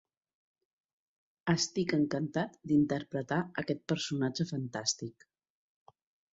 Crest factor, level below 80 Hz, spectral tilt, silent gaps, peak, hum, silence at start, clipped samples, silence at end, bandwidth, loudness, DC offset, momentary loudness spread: 20 dB; -68 dBFS; -4.5 dB/octave; none; -16 dBFS; none; 1.45 s; under 0.1%; 1.2 s; 8 kHz; -33 LUFS; under 0.1%; 7 LU